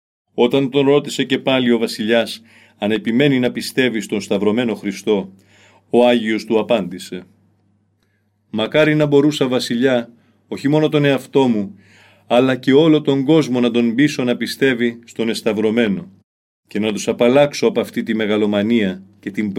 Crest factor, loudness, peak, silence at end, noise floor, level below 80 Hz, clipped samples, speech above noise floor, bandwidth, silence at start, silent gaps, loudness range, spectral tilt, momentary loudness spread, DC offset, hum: 16 dB; -17 LUFS; -2 dBFS; 0 s; -63 dBFS; -62 dBFS; under 0.1%; 47 dB; 16 kHz; 0.35 s; 16.23-16.63 s; 3 LU; -5.5 dB/octave; 10 LU; under 0.1%; none